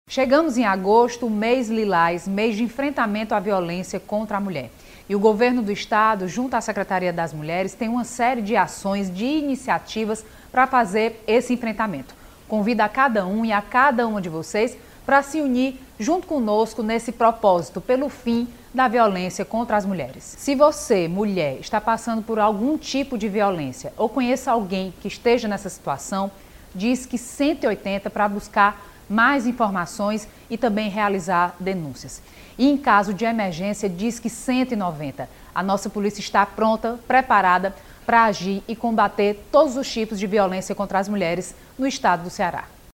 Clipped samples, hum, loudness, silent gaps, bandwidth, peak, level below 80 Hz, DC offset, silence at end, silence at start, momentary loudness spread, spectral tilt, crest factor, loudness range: under 0.1%; none; -22 LUFS; none; 17 kHz; -2 dBFS; -50 dBFS; under 0.1%; 0.25 s; 0.1 s; 10 LU; -5 dB/octave; 18 dB; 3 LU